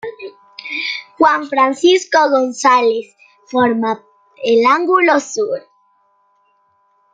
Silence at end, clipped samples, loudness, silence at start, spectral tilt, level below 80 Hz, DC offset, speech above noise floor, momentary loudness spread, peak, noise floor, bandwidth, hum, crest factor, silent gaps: 1.55 s; under 0.1%; -14 LUFS; 0.05 s; -3 dB/octave; -66 dBFS; under 0.1%; 45 dB; 14 LU; 0 dBFS; -59 dBFS; 9.4 kHz; none; 16 dB; none